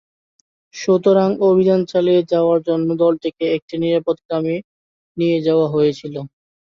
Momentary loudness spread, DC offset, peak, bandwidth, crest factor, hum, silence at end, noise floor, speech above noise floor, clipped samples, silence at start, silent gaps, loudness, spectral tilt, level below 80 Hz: 13 LU; under 0.1%; -4 dBFS; 7.2 kHz; 14 dB; none; 0.4 s; under -90 dBFS; over 74 dB; under 0.1%; 0.75 s; 3.62-3.68 s, 4.25-4.29 s, 4.64-5.15 s; -17 LUFS; -7.5 dB/octave; -62 dBFS